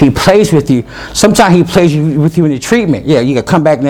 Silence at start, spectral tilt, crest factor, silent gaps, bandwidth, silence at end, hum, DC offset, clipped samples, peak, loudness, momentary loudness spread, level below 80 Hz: 0 s; -6 dB/octave; 8 dB; none; 17 kHz; 0 s; none; under 0.1%; 1%; 0 dBFS; -9 LUFS; 5 LU; -34 dBFS